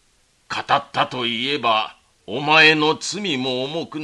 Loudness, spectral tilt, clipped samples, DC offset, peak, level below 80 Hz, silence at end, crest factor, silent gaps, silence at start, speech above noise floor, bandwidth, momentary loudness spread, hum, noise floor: -18 LUFS; -3 dB/octave; under 0.1%; under 0.1%; 0 dBFS; -62 dBFS; 0 s; 20 dB; none; 0.5 s; 41 dB; 11.5 kHz; 16 LU; none; -60 dBFS